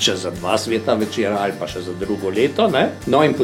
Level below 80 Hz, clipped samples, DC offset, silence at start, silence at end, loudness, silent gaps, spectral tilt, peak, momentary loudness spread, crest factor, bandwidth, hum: -48 dBFS; under 0.1%; under 0.1%; 0 s; 0 s; -19 LUFS; none; -4.5 dB/octave; -4 dBFS; 8 LU; 16 dB; 16 kHz; none